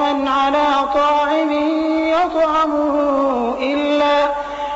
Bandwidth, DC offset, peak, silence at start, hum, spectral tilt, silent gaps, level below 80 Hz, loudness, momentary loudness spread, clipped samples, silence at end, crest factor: 8 kHz; under 0.1%; -8 dBFS; 0 s; none; -1 dB/octave; none; -46 dBFS; -17 LUFS; 4 LU; under 0.1%; 0 s; 8 dB